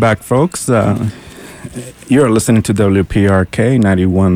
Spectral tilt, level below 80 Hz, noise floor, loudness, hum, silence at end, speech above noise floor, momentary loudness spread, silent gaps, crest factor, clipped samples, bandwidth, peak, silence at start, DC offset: -6.5 dB/octave; -36 dBFS; -31 dBFS; -12 LUFS; none; 0 s; 19 dB; 18 LU; none; 12 dB; under 0.1%; 16 kHz; 0 dBFS; 0 s; under 0.1%